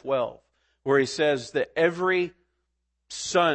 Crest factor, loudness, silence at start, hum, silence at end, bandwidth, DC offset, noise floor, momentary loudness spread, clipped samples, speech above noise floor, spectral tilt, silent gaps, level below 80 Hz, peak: 18 dB; -25 LUFS; 0.05 s; none; 0 s; 8.8 kHz; under 0.1%; -77 dBFS; 11 LU; under 0.1%; 53 dB; -4 dB/octave; none; -66 dBFS; -8 dBFS